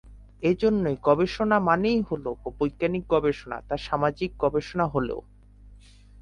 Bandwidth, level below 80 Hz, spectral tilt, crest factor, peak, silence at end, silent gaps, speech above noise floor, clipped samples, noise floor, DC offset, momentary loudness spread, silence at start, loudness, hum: 10 kHz; -46 dBFS; -7.5 dB/octave; 20 dB; -6 dBFS; 0.45 s; none; 25 dB; under 0.1%; -50 dBFS; under 0.1%; 9 LU; 0.05 s; -25 LUFS; none